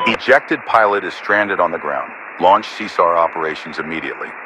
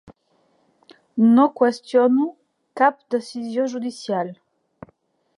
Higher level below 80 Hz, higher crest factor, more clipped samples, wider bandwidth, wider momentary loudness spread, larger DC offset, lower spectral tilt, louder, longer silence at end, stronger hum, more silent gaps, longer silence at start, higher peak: first, -58 dBFS vs -70 dBFS; about the same, 16 dB vs 18 dB; neither; about the same, 10.5 kHz vs 11 kHz; second, 10 LU vs 13 LU; neither; second, -4.5 dB/octave vs -6 dB/octave; first, -16 LUFS vs -20 LUFS; second, 0 s vs 1.05 s; neither; neither; second, 0 s vs 1.15 s; first, 0 dBFS vs -4 dBFS